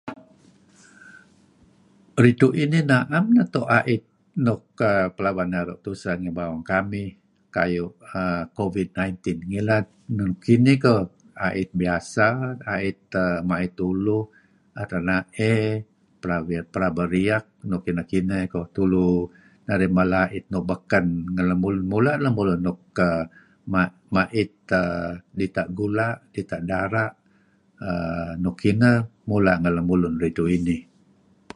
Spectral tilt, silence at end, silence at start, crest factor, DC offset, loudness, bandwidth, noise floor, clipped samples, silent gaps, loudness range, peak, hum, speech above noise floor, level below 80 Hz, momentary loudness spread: -7.5 dB/octave; 0.75 s; 0.05 s; 22 dB; under 0.1%; -23 LUFS; 11.5 kHz; -60 dBFS; under 0.1%; none; 5 LU; -2 dBFS; none; 38 dB; -46 dBFS; 11 LU